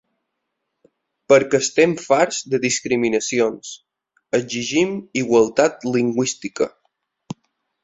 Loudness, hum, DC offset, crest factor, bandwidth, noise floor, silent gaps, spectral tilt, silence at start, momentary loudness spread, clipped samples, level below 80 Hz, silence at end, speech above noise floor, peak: -19 LUFS; none; under 0.1%; 18 dB; 8.2 kHz; -77 dBFS; none; -4 dB/octave; 1.3 s; 18 LU; under 0.1%; -60 dBFS; 0.5 s; 58 dB; -2 dBFS